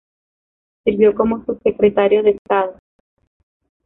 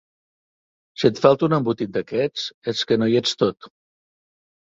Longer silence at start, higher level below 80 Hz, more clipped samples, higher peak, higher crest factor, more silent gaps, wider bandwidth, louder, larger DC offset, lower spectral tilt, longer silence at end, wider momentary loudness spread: second, 0.85 s vs 1 s; first, -50 dBFS vs -60 dBFS; neither; about the same, -2 dBFS vs -2 dBFS; second, 16 dB vs 22 dB; about the same, 2.38-2.45 s vs 2.54-2.62 s; second, 3.8 kHz vs 8 kHz; first, -17 LUFS vs -21 LUFS; neither; first, -10 dB/octave vs -5.5 dB/octave; first, 1.15 s vs 1 s; about the same, 7 LU vs 9 LU